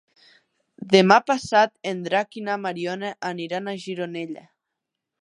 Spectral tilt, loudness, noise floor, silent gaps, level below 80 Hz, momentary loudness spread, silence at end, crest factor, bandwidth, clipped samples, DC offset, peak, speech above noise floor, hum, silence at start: -5 dB/octave; -22 LUFS; -83 dBFS; none; -70 dBFS; 14 LU; 0.85 s; 24 dB; 11 kHz; under 0.1%; under 0.1%; 0 dBFS; 60 dB; none; 0.8 s